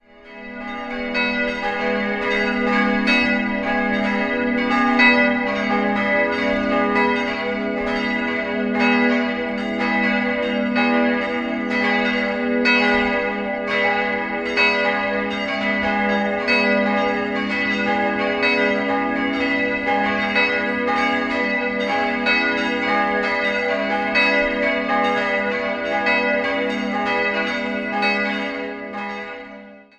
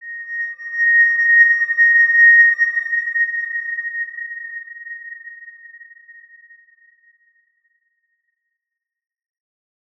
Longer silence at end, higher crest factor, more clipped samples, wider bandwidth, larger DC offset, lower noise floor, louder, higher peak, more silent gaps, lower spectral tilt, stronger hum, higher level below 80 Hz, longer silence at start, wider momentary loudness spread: second, 0.15 s vs 4.2 s; about the same, 18 dB vs 16 dB; neither; first, 9 kHz vs 6 kHz; neither; second, -40 dBFS vs -85 dBFS; second, -19 LUFS vs -13 LUFS; about the same, -2 dBFS vs -2 dBFS; neither; first, -5.5 dB/octave vs 2.5 dB/octave; neither; first, -48 dBFS vs -82 dBFS; first, 0.2 s vs 0 s; second, 6 LU vs 23 LU